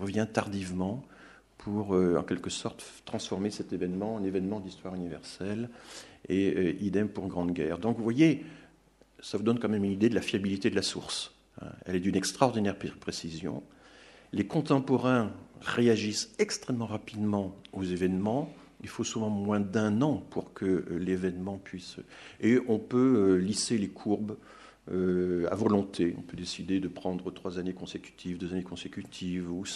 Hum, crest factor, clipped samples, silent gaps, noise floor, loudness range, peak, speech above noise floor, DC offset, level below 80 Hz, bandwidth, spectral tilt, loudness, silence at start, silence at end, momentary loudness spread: none; 24 dB; under 0.1%; none; -62 dBFS; 5 LU; -6 dBFS; 32 dB; under 0.1%; -62 dBFS; 12.5 kHz; -5.5 dB/octave; -31 LUFS; 0 s; 0 s; 14 LU